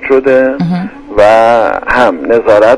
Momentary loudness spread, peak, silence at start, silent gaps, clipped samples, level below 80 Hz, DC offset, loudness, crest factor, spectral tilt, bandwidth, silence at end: 9 LU; 0 dBFS; 0 s; none; 0.7%; -36 dBFS; under 0.1%; -9 LUFS; 8 dB; -6.5 dB/octave; 11 kHz; 0 s